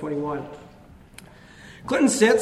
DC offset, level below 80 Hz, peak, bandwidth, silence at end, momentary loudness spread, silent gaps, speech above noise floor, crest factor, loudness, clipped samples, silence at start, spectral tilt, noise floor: under 0.1%; -56 dBFS; -4 dBFS; 14.5 kHz; 0 s; 27 LU; none; 26 dB; 20 dB; -22 LUFS; under 0.1%; 0 s; -4 dB/octave; -47 dBFS